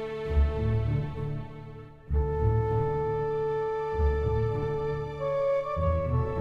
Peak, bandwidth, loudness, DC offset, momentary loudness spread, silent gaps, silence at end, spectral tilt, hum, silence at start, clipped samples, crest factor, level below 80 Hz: -14 dBFS; 5.2 kHz; -29 LUFS; under 0.1%; 8 LU; none; 0 s; -9.5 dB/octave; none; 0 s; under 0.1%; 14 dB; -34 dBFS